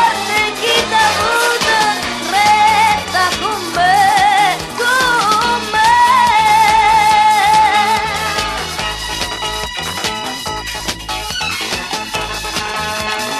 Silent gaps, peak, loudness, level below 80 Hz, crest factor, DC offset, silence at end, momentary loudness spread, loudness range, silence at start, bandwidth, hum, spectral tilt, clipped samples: none; 0 dBFS; -13 LUFS; -38 dBFS; 14 dB; under 0.1%; 0 s; 10 LU; 9 LU; 0 s; 14.5 kHz; none; -1.5 dB/octave; under 0.1%